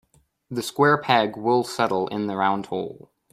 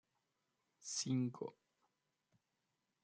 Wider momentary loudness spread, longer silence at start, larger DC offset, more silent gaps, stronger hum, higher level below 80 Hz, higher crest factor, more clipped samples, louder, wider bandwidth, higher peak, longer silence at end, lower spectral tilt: about the same, 11 LU vs 13 LU; second, 0.5 s vs 0.8 s; neither; neither; neither; first, -64 dBFS vs under -90 dBFS; about the same, 20 dB vs 20 dB; neither; first, -23 LUFS vs -42 LUFS; first, 15.5 kHz vs 9.4 kHz; first, -4 dBFS vs -28 dBFS; second, 0.35 s vs 1.5 s; about the same, -5 dB/octave vs -4.5 dB/octave